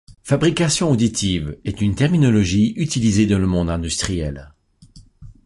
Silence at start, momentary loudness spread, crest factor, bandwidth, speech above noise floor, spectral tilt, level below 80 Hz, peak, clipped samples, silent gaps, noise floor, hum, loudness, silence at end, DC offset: 0.1 s; 8 LU; 16 dB; 11.5 kHz; 29 dB; -5.5 dB/octave; -36 dBFS; -4 dBFS; under 0.1%; none; -47 dBFS; none; -19 LUFS; 0.15 s; under 0.1%